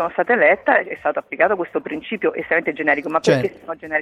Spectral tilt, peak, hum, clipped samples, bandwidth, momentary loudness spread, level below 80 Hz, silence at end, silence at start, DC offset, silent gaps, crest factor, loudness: -5.5 dB/octave; -2 dBFS; none; under 0.1%; 12 kHz; 11 LU; -60 dBFS; 0 s; 0 s; under 0.1%; none; 18 dB; -19 LUFS